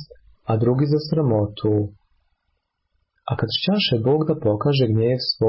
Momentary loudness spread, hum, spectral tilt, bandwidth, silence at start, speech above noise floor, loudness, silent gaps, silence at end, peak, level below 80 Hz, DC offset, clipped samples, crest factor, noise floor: 7 LU; none; -11 dB/octave; 5.8 kHz; 0 s; 54 dB; -21 LUFS; none; 0 s; -8 dBFS; -50 dBFS; under 0.1%; under 0.1%; 12 dB; -73 dBFS